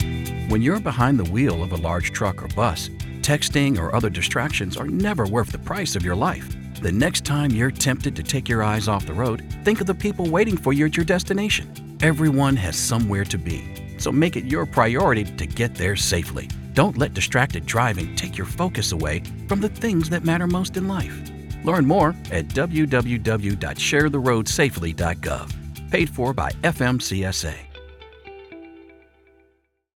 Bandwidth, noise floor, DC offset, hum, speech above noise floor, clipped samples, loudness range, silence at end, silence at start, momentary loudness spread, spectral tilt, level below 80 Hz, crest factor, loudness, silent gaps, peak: 18 kHz; -65 dBFS; under 0.1%; none; 43 dB; under 0.1%; 3 LU; 1.05 s; 0 s; 9 LU; -5 dB/octave; -38 dBFS; 20 dB; -22 LUFS; none; -2 dBFS